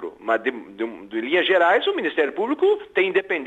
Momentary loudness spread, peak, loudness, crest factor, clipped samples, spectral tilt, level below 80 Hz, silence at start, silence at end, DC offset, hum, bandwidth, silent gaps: 12 LU; -8 dBFS; -21 LUFS; 14 dB; under 0.1%; -5 dB/octave; -68 dBFS; 0 s; 0 s; under 0.1%; none; 8 kHz; none